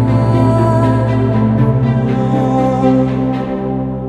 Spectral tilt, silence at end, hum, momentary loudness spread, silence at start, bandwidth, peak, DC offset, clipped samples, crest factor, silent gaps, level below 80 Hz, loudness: -9.5 dB/octave; 0 s; none; 6 LU; 0 s; 8.8 kHz; 0 dBFS; under 0.1%; under 0.1%; 12 dB; none; -32 dBFS; -13 LUFS